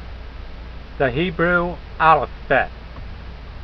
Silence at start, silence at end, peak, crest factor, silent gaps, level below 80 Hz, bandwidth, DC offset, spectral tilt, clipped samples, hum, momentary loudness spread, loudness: 0 s; 0 s; 0 dBFS; 20 dB; none; -34 dBFS; 6 kHz; under 0.1%; -8.5 dB/octave; under 0.1%; none; 22 LU; -19 LUFS